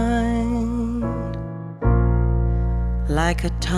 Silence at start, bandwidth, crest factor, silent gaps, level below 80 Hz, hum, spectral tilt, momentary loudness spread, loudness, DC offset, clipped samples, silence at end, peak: 0 s; 11.5 kHz; 16 dB; none; -24 dBFS; none; -7 dB/octave; 8 LU; -22 LUFS; under 0.1%; under 0.1%; 0 s; -4 dBFS